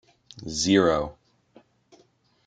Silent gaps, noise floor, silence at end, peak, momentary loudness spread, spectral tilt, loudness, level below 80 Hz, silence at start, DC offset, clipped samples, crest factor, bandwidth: none; -63 dBFS; 1.35 s; -6 dBFS; 17 LU; -4 dB/octave; -23 LUFS; -52 dBFS; 0.35 s; under 0.1%; under 0.1%; 22 dB; 9.4 kHz